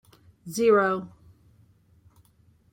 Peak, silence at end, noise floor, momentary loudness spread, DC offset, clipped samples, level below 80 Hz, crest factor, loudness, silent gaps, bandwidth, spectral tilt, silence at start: -10 dBFS; 1.65 s; -61 dBFS; 26 LU; under 0.1%; under 0.1%; -66 dBFS; 18 dB; -24 LUFS; none; 16.5 kHz; -5 dB/octave; 0.45 s